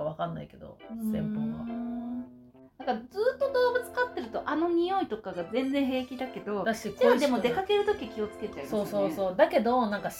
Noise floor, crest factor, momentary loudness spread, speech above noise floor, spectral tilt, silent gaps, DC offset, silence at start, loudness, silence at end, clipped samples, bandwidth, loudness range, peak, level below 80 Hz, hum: -53 dBFS; 20 dB; 12 LU; 24 dB; -5.5 dB/octave; none; under 0.1%; 0 s; -29 LUFS; 0 s; under 0.1%; 17 kHz; 4 LU; -10 dBFS; -60 dBFS; none